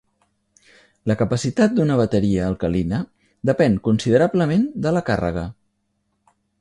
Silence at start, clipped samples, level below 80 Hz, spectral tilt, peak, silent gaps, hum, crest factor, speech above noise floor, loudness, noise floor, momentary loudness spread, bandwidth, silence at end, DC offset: 1.05 s; under 0.1%; -42 dBFS; -7 dB/octave; -4 dBFS; none; none; 18 dB; 52 dB; -20 LUFS; -71 dBFS; 9 LU; 11 kHz; 1.1 s; under 0.1%